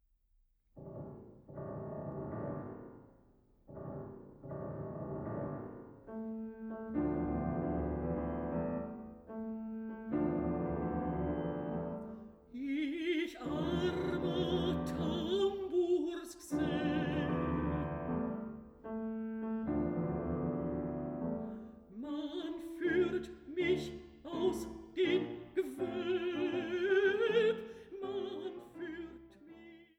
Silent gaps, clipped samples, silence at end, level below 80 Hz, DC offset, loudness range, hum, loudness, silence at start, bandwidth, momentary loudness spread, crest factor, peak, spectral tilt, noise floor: none; under 0.1%; 0.15 s; -54 dBFS; under 0.1%; 11 LU; none; -37 LUFS; 0.75 s; 14 kHz; 15 LU; 18 dB; -20 dBFS; -7 dB/octave; -73 dBFS